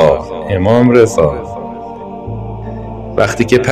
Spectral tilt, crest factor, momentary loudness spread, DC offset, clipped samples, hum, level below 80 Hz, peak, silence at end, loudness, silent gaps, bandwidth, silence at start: -6.5 dB/octave; 12 dB; 17 LU; under 0.1%; 0.4%; none; -34 dBFS; 0 dBFS; 0 s; -12 LUFS; none; 14 kHz; 0 s